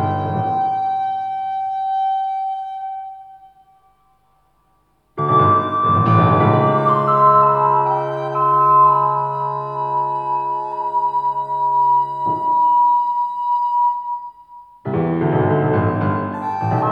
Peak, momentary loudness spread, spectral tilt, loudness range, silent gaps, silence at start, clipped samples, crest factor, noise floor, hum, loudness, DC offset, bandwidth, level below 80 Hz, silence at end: -2 dBFS; 11 LU; -9.5 dB/octave; 9 LU; none; 0 s; under 0.1%; 16 dB; -61 dBFS; none; -17 LUFS; under 0.1%; 5.2 kHz; -58 dBFS; 0 s